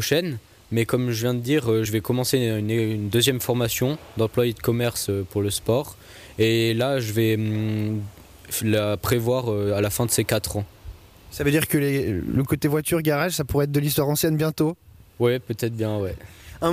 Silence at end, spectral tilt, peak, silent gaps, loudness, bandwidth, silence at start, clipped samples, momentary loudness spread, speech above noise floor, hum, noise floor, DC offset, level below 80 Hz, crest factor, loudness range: 0 s; -5 dB/octave; -8 dBFS; none; -23 LUFS; 15.5 kHz; 0 s; under 0.1%; 8 LU; 19 dB; none; -42 dBFS; under 0.1%; -48 dBFS; 16 dB; 2 LU